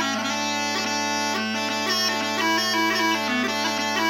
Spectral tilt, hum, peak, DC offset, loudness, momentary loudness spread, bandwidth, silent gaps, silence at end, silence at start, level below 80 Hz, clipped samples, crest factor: -2 dB/octave; none; -10 dBFS; under 0.1%; -22 LUFS; 3 LU; 16.5 kHz; none; 0 s; 0 s; -76 dBFS; under 0.1%; 14 dB